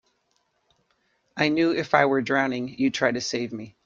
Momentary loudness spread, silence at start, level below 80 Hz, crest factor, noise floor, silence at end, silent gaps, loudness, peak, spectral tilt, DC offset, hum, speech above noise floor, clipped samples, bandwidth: 9 LU; 1.35 s; -66 dBFS; 22 dB; -71 dBFS; 0.15 s; none; -24 LUFS; -2 dBFS; -4.5 dB/octave; under 0.1%; none; 47 dB; under 0.1%; 7.6 kHz